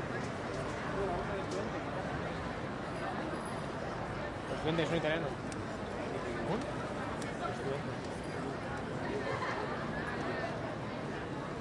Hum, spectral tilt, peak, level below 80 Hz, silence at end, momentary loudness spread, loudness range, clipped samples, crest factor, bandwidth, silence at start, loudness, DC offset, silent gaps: none; -6 dB/octave; -18 dBFS; -54 dBFS; 0 s; 5 LU; 2 LU; under 0.1%; 18 dB; 11.5 kHz; 0 s; -38 LUFS; under 0.1%; none